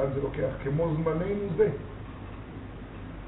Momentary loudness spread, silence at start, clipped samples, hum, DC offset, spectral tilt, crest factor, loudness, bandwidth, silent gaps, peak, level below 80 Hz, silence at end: 15 LU; 0 s; under 0.1%; none; under 0.1%; -8 dB/octave; 20 dB; -29 LUFS; 4 kHz; none; -10 dBFS; -44 dBFS; 0 s